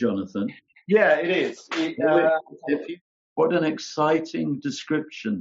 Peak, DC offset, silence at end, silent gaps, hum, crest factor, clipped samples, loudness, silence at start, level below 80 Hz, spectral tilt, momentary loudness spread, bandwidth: -8 dBFS; under 0.1%; 0 s; 3.01-3.36 s; none; 16 dB; under 0.1%; -24 LUFS; 0 s; -72 dBFS; -4 dB/octave; 11 LU; 7.6 kHz